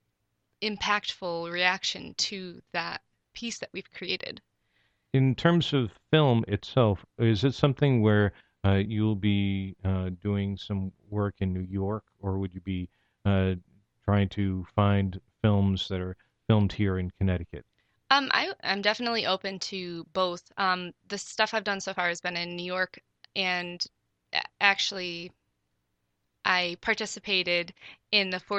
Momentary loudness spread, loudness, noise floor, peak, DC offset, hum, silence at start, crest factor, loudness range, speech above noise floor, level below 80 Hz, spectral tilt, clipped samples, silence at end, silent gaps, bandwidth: 12 LU; -28 LUFS; -78 dBFS; -4 dBFS; under 0.1%; none; 0.6 s; 26 dB; 6 LU; 50 dB; -56 dBFS; -5.5 dB/octave; under 0.1%; 0 s; none; 8.4 kHz